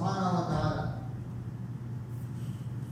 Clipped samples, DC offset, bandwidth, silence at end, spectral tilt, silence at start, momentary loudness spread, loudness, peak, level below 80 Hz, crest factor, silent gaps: under 0.1%; under 0.1%; 15 kHz; 0 s; -7.5 dB/octave; 0 s; 10 LU; -35 LUFS; -16 dBFS; -52 dBFS; 16 dB; none